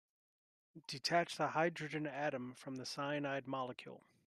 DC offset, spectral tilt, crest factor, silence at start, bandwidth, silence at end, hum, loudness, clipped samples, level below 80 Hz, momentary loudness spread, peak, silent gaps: under 0.1%; -4.5 dB/octave; 20 dB; 0.75 s; 13 kHz; 0.3 s; none; -40 LUFS; under 0.1%; -84 dBFS; 12 LU; -20 dBFS; none